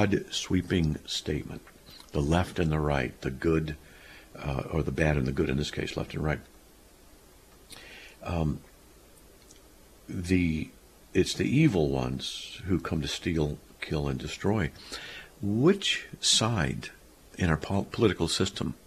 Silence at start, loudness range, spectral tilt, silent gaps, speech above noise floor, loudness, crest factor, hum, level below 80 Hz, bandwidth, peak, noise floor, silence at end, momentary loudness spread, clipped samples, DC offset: 0 s; 8 LU; -5 dB/octave; none; 27 dB; -29 LUFS; 22 dB; none; -44 dBFS; 14 kHz; -8 dBFS; -55 dBFS; 0.1 s; 18 LU; under 0.1%; under 0.1%